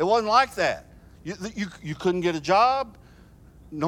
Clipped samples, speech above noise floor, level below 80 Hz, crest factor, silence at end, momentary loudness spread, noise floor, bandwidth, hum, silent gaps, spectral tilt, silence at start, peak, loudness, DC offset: under 0.1%; 27 dB; -52 dBFS; 18 dB; 0 s; 17 LU; -51 dBFS; 16 kHz; none; none; -5 dB/octave; 0 s; -6 dBFS; -24 LUFS; under 0.1%